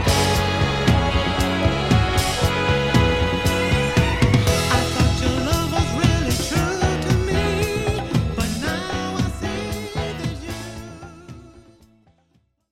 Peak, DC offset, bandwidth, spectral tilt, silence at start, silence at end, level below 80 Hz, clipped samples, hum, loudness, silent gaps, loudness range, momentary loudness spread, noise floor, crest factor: -2 dBFS; under 0.1%; 16.5 kHz; -5 dB/octave; 0 s; 1.2 s; -30 dBFS; under 0.1%; none; -20 LUFS; none; 9 LU; 9 LU; -64 dBFS; 18 dB